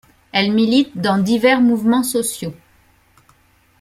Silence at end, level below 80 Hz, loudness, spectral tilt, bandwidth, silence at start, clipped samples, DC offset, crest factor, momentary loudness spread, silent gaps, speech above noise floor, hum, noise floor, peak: 1.3 s; -56 dBFS; -16 LUFS; -4.5 dB/octave; 15.5 kHz; 0.35 s; under 0.1%; under 0.1%; 16 dB; 9 LU; none; 40 dB; none; -56 dBFS; -2 dBFS